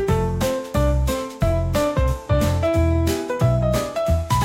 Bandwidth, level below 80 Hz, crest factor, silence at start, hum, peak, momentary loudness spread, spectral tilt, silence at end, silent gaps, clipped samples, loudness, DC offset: 16.5 kHz; -26 dBFS; 12 dB; 0 s; none; -6 dBFS; 3 LU; -6.5 dB/octave; 0 s; none; under 0.1%; -21 LUFS; under 0.1%